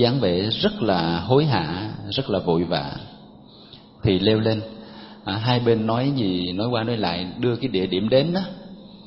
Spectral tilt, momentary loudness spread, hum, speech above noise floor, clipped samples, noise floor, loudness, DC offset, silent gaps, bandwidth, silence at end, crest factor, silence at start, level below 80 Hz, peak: -10.5 dB/octave; 14 LU; none; 24 dB; under 0.1%; -46 dBFS; -22 LUFS; under 0.1%; none; 5.8 kHz; 0 s; 20 dB; 0 s; -50 dBFS; -4 dBFS